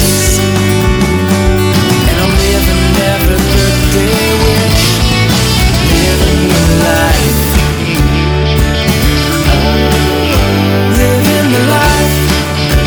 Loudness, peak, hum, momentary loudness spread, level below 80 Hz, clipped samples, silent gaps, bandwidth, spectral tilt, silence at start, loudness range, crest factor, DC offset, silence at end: -9 LUFS; 0 dBFS; none; 2 LU; -16 dBFS; under 0.1%; none; over 20 kHz; -4.5 dB/octave; 0 s; 1 LU; 8 dB; under 0.1%; 0 s